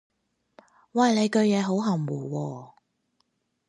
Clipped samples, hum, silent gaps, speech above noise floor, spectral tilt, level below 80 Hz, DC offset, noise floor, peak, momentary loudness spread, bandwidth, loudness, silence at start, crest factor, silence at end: under 0.1%; none; none; 50 dB; -6 dB/octave; -76 dBFS; under 0.1%; -74 dBFS; -10 dBFS; 11 LU; 10.5 kHz; -25 LUFS; 0.95 s; 18 dB; 1.05 s